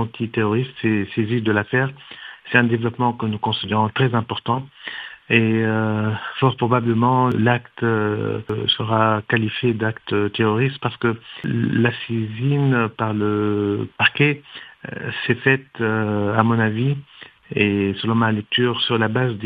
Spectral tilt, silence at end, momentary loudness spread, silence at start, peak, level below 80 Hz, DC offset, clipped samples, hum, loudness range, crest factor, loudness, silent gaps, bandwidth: -9 dB/octave; 0 s; 8 LU; 0 s; 0 dBFS; -60 dBFS; under 0.1%; under 0.1%; none; 2 LU; 20 dB; -20 LUFS; none; 5 kHz